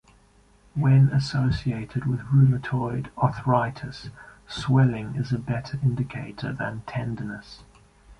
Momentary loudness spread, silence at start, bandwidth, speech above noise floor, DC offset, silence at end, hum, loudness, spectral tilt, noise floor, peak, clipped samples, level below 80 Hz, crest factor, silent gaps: 15 LU; 0.75 s; 9 kHz; 34 dB; under 0.1%; 0.05 s; none; -25 LUFS; -8 dB/octave; -57 dBFS; -6 dBFS; under 0.1%; -48 dBFS; 18 dB; none